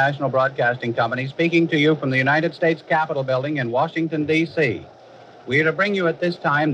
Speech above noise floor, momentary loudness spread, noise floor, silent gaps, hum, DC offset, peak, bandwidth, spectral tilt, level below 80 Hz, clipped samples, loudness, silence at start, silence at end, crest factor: 25 dB; 5 LU; -45 dBFS; none; none; under 0.1%; -6 dBFS; 8.8 kHz; -7 dB/octave; -66 dBFS; under 0.1%; -20 LUFS; 0 s; 0 s; 14 dB